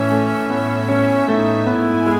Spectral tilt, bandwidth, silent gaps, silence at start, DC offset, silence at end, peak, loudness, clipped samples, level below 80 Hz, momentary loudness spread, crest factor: -7.5 dB/octave; 16.5 kHz; none; 0 s; under 0.1%; 0 s; -4 dBFS; -17 LUFS; under 0.1%; -52 dBFS; 4 LU; 12 dB